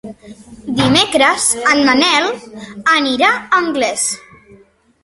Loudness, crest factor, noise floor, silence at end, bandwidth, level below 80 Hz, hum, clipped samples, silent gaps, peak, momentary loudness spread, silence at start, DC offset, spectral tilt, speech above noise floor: -13 LUFS; 16 dB; -48 dBFS; 0.85 s; 12 kHz; -48 dBFS; none; under 0.1%; none; 0 dBFS; 17 LU; 0.05 s; under 0.1%; -2.5 dB/octave; 34 dB